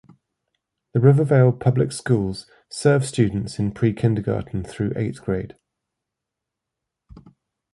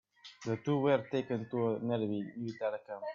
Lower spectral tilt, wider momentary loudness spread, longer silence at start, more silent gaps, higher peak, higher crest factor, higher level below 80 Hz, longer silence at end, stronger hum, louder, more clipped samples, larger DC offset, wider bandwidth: about the same, -7.5 dB/octave vs -7.5 dB/octave; about the same, 12 LU vs 11 LU; first, 0.95 s vs 0.25 s; neither; first, -2 dBFS vs -18 dBFS; about the same, 20 dB vs 18 dB; first, -48 dBFS vs -78 dBFS; first, 2.25 s vs 0 s; neither; first, -21 LUFS vs -35 LUFS; neither; neither; first, 11.5 kHz vs 7.4 kHz